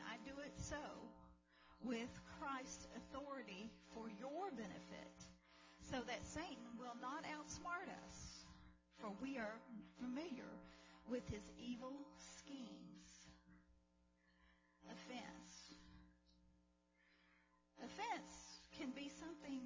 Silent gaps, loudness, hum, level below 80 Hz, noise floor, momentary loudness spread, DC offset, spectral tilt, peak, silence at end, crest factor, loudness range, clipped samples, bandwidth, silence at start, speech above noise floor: none; -53 LUFS; 60 Hz at -70 dBFS; -70 dBFS; -79 dBFS; 15 LU; under 0.1%; -4 dB/octave; -34 dBFS; 0 s; 20 dB; 10 LU; under 0.1%; 7.6 kHz; 0 s; 27 dB